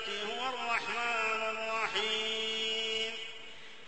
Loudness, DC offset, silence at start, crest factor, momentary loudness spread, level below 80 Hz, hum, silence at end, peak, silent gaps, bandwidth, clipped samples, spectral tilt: -33 LUFS; 0.3%; 0 s; 16 dB; 8 LU; -74 dBFS; none; 0 s; -18 dBFS; none; 8.4 kHz; under 0.1%; -0.5 dB/octave